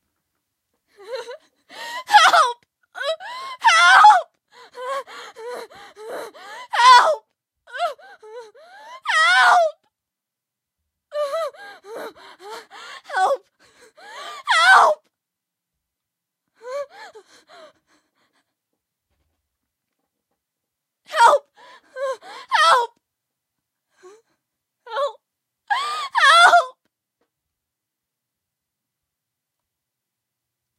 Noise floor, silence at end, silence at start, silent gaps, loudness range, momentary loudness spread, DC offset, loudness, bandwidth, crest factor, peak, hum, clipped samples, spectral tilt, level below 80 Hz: -85 dBFS; 4.1 s; 1.1 s; none; 14 LU; 25 LU; under 0.1%; -16 LUFS; 15.5 kHz; 22 dB; 0 dBFS; none; under 0.1%; 2 dB/octave; -84 dBFS